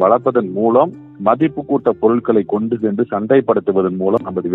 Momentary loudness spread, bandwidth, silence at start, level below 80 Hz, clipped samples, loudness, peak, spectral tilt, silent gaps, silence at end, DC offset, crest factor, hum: 5 LU; 4 kHz; 0 s; -58 dBFS; under 0.1%; -16 LUFS; 0 dBFS; -10.5 dB/octave; none; 0 s; under 0.1%; 16 dB; none